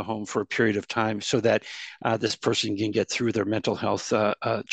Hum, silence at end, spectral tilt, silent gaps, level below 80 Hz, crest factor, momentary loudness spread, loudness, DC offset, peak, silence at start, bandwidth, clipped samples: none; 0 s; -4.5 dB/octave; none; -66 dBFS; 18 dB; 4 LU; -26 LUFS; under 0.1%; -8 dBFS; 0 s; 9.2 kHz; under 0.1%